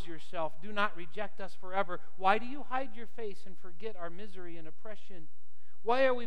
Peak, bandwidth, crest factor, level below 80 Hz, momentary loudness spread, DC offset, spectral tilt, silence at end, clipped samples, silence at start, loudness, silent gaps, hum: -10 dBFS; 12 kHz; 24 dB; -88 dBFS; 20 LU; 4%; -6 dB/octave; 0 s; under 0.1%; 0 s; -36 LUFS; none; none